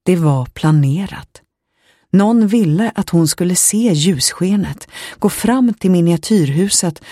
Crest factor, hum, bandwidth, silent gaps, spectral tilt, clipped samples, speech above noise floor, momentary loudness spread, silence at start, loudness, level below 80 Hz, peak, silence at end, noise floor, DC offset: 14 dB; none; 15.5 kHz; none; -5 dB/octave; under 0.1%; 45 dB; 7 LU; 0.05 s; -14 LUFS; -46 dBFS; 0 dBFS; 0 s; -59 dBFS; under 0.1%